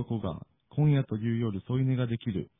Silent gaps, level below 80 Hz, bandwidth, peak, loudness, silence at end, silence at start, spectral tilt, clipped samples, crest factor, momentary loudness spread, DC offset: none; -56 dBFS; 3.8 kHz; -16 dBFS; -30 LUFS; 0.15 s; 0 s; -12 dB/octave; under 0.1%; 14 dB; 11 LU; under 0.1%